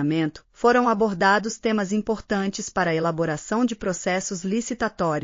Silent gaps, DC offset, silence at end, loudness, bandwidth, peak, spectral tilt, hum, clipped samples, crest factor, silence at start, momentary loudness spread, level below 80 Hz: none; under 0.1%; 0 s; -23 LUFS; 7.4 kHz; -6 dBFS; -4.5 dB/octave; none; under 0.1%; 16 dB; 0 s; 7 LU; -52 dBFS